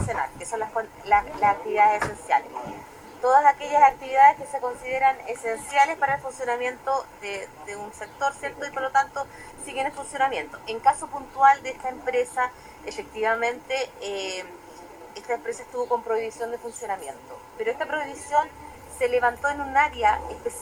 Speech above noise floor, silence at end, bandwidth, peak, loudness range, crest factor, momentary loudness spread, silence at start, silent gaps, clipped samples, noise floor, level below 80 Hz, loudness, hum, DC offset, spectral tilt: 19 dB; 0 s; 16 kHz; -4 dBFS; 9 LU; 20 dB; 18 LU; 0 s; none; under 0.1%; -44 dBFS; -54 dBFS; -24 LUFS; none; under 0.1%; -3 dB/octave